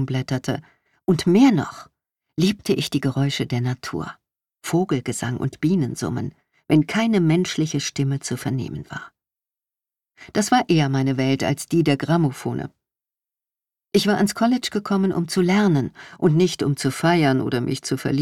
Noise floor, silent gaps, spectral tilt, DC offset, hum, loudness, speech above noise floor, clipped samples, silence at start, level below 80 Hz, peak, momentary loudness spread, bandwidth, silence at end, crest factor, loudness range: under -90 dBFS; none; -6 dB/octave; under 0.1%; none; -21 LUFS; over 70 dB; under 0.1%; 0 s; -56 dBFS; -6 dBFS; 12 LU; 16 kHz; 0 s; 16 dB; 4 LU